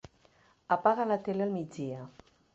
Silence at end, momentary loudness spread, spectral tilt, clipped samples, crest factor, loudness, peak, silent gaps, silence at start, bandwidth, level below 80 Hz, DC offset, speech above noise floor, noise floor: 0.45 s; 14 LU; -7.5 dB/octave; under 0.1%; 22 dB; -31 LUFS; -12 dBFS; none; 0.7 s; 8 kHz; -70 dBFS; under 0.1%; 34 dB; -65 dBFS